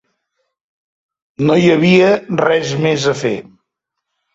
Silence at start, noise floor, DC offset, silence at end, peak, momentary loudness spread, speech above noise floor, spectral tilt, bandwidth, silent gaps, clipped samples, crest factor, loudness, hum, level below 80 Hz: 1.4 s; -77 dBFS; under 0.1%; 0.95 s; -2 dBFS; 9 LU; 64 dB; -6 dB/octave; 8 kHz; none; under 0.1%; 14 dB; -13 LUFS; none; -54 dBFS